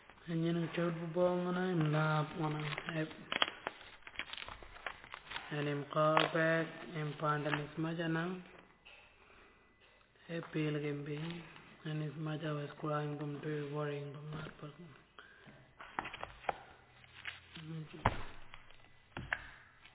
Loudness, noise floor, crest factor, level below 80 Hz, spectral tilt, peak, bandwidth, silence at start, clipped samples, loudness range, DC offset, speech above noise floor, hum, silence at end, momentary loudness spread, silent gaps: -39 LUFS; -66 dBFS; 30 dB; -62 dBFS; -4.5 dB/octave; -10 dBFS; 4 kHz; 0 s; under 0.1%; 9 LU; under 0.1%; 29 dB; none; 0.1 s; 22 LU; none